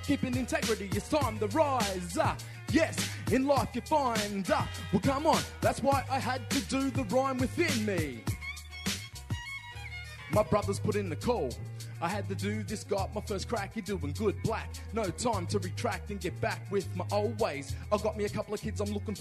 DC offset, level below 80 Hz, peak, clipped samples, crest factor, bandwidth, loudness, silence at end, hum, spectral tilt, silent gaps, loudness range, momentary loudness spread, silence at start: under 0.1%; -48 dBFS; -14 dBFS; under 0.1%; 18 dB; 13.5 kHz; -32 LUFS; 0 s; none; -5 dB/octave; none; 4 LU; 9 LU; 0 s